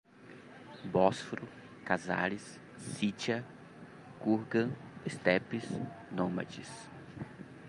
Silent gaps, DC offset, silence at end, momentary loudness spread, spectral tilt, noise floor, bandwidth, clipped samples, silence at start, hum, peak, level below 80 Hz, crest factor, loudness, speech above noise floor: none; under 0.1%; 0 s; 21 LU; -5.5 dB/octave; -54 dBFS; 11.5 kHz; under 0.1%; 0.15 s; none; -12 dBFS; -68 dBFS; 24 dB; -35 LUFS; 20 dB